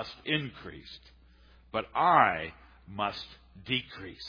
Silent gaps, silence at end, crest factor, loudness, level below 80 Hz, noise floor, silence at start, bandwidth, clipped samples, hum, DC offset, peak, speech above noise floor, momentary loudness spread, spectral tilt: none; 0 s; 24 dB; -29 LUFS; -58 dBFS; -58 dBFS; 0 s; 5.2 kHz; under 0.1%; none; under 0.1%; -8 dBFS; 27 dB; 23 LU; -6 dB/octave